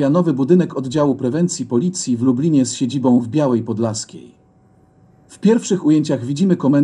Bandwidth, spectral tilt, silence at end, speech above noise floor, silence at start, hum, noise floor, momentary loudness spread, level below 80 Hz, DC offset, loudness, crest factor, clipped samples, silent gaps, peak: 11 kHz; -6.5 dB/octave; 0 s; 36 dB; 0 s; none; -52 dBFS; 6 LU; -60 dBFS; under 0.1%; -17 LUFS; 16 dB; under 0.1%; none; -2 dBFS